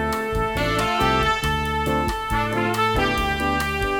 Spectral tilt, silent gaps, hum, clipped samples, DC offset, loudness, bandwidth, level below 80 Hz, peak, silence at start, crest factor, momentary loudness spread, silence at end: -4.5 dB/octave; none; none; under 0.1%; under 0.1%; -21 LUFS; 18 kHz; -32 dBFS; -6 dBFS; 0 s; 16 dB; 4 LU; 0 s